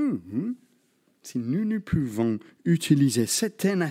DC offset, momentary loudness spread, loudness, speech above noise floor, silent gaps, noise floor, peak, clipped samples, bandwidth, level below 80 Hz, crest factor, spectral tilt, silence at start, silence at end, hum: under 0.1%; 11 LU; -26 LUFS; 42 dB; none; -66 dBFS; -6 dBFS; under 0.1%; 16.5 kHz; -54 dBFS; 18 dB; -5.5 dB/octave; 0 s; 0 s; none